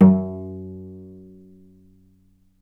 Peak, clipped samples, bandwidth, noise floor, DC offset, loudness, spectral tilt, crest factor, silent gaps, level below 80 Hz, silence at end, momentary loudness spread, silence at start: 0 dBFS; under 0.1%; 2.4 kHz; -58 dBFS; under 0.1%; -23 LUFS; -12.5 dB/octave; 22 dB; none; -58 dBFS; 1.75 s; 25 LU; 0 s